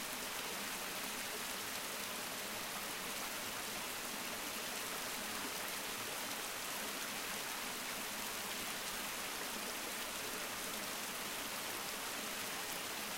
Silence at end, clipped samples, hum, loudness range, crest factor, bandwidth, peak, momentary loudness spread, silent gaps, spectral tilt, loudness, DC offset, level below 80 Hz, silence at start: 0 s; under 0.1%; none; 0 LU; 16 dB; 16 kHz; -26 dBFS; 1 LU; none; -0.5 dB/octave; -41 LUFS; under 0.1%; -68 dBFS; 0 s